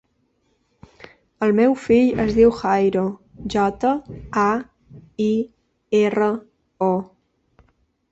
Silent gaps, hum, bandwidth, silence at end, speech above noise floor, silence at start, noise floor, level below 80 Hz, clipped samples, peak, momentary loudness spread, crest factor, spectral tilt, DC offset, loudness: none; none; 8 kHz; 1.05 s; 48 dB; 1.4 s; -66 dBFS; -48 dBFS; under 0.1%; -4 dBFS; 13 LU; 18 dB; -7 dB/octave; under 0.1%; -20 LUFS